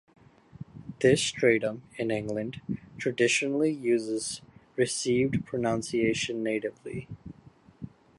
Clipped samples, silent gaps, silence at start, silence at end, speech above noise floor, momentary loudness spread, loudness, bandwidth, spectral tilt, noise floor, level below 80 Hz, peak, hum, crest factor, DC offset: under 0.1%; none; 0.6 s; 0.3 s; 28 dB; 21 LU; -28 LUFS; 11.5 kHz; -4.5 dB/octave; -56 dBFS; -60 dBFS; -8 dBFS; none; 20 dB; under 0.1%